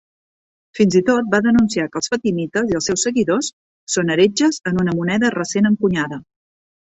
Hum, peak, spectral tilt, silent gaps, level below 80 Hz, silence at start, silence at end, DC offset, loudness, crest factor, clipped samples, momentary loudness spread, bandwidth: none; -2 dBFS; -4.5 dB/octave; 3.53-3.87 s; -52 dBFS; 0.75 s; 0.7 s; under 0.1%; -18 LUFS; 16 dB; under 0.1%; 7 LU; 8.2 kHz